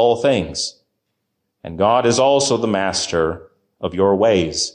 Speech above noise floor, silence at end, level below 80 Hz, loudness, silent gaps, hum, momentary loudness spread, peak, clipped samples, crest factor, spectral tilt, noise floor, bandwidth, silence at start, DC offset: 57 dB; 0.05 s; -44 dBFS; -17 LUFS; none; none; 13 LU; -4 dBFS; under 0.1%; 14 dB; -4 dB/octave; -74 dBFS; 10.5 kHz; 0 s; under 0.1%